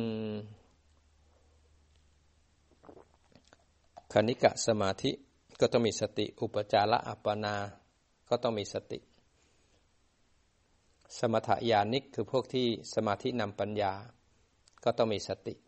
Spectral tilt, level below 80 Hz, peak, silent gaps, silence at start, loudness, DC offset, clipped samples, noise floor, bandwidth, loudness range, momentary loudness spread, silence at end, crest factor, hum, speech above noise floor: -5 dB/octave; -68 dBFS; -10 dBFS; none; 0 s; -32 LUFS; under 0.1%; under 0.1%; -70 dBFS; 8.4 kHz; 9 LU; 12 LU; 0.15 s; 24 dB; none; 39 dB